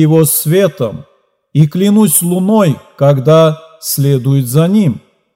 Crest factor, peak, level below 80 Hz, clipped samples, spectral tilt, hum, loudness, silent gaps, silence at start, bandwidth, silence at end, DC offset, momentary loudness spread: 10 dB; 0 dBFS; -56 dBFS; 0.3%; -6 dB/octave; none; -11 LUFS; none; 0 s; 16.5 kHz; 0.35 s; under 0.1%; 10 LU